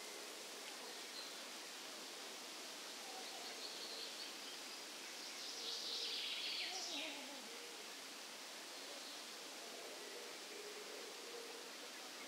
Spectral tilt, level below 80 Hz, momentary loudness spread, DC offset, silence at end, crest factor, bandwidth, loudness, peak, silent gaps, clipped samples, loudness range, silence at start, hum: 0.5 dB/octave; under -90 dBFS; 8 LU; under 0.1%; 0 s; 18 dB; 16 kHz; -47 LUFS; -32 dBFS; none; under 0.1%; 5 LU; 0 s; none